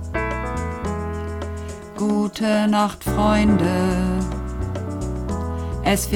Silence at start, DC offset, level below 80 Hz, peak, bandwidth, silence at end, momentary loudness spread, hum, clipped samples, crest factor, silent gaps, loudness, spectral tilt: 0 s; under 0.1%; -32 dBFS; -6 dBFS; 19 kHz; 0 s; 11 LU; none; under 0.1%; 16 dB; none; -22 LUFS; -6 dB/octave